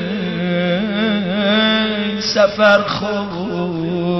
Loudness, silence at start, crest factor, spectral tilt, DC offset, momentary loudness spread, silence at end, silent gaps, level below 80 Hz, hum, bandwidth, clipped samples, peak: -16 LUFS; 0 s; 16 dB; -5.5 dB/octave; 0.2%; 9 LU; 0 s; none; -52 dBFS; none; 6.2 kHz; under 0.1%; 0 dBFS